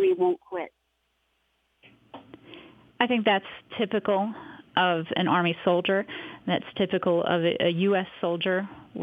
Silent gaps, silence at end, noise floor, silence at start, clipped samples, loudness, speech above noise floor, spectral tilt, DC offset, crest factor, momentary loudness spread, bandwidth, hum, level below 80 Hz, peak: none; 0 s; -73 dBFS; 0 s; under 0.1%; -26 LUFS; 48 dB; -8 dB/octave; under 0.1%; 20 dB; 12 LU; 4.9 kHz; none; -70 dBFS; -6 dBFS